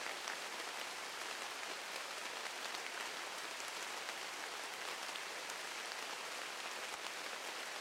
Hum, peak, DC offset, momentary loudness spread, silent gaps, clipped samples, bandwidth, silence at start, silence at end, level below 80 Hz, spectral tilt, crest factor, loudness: none; -24 dBFS; under 0.1%; 1 LU; none; under 0.1%; 16 kHz; 0 s; 0 s; under -90 dBFS; 1 dB/octave; 22 dB; -43 LUFS